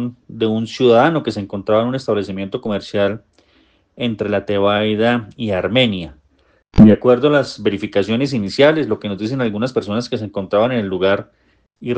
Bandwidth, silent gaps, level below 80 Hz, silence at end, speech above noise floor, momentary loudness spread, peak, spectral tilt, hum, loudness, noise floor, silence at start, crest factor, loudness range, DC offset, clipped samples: 8.8 kHz; none; -38 dBFS; 0 s; 41 dB; 11 LU; 0 dBFS; -7 dB/octave; none; -17 LUFS; -57 dBFS; 0 s; 16 dB; 5 LU; under 0.1%; under 0.1%